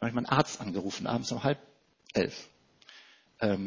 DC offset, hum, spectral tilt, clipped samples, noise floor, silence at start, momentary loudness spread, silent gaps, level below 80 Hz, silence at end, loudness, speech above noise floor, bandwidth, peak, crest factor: under 0.1%; none; -5.5 dB/octave; under 0.1%; -57 dBFS; 0 s; 14 LU; none; -62 dBFS; 0 s; -32 LUFS; 26 dB; 7.6 kHz; -6 dBFS; 26 dB